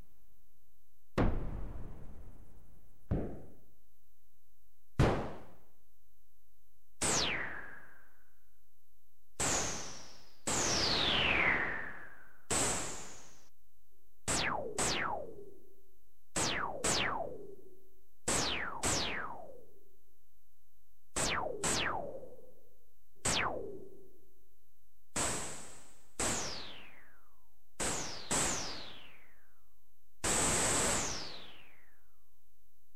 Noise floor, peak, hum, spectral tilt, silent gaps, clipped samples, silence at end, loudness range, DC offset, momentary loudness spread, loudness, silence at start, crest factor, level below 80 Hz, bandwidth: -76 dBFS; -18 dBFS; none; -2 dB/octave; none; under 0.1%; 1.35 s; 8 LU; 0.9%; 22 LU; -34 LUFS; 1.15 s; 22 dB; -50 dBFS; 16 kHz